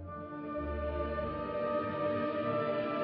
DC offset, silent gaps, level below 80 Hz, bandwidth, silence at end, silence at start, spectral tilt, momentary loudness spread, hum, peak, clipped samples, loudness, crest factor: under 0.1%; none; -48 dBFS; 5.4 kHz; 0 s; 0 s; -5.5 dB/octave; 6 LU; none; -22 dBFS; under 0.1%; -35 LUFS; 12 dB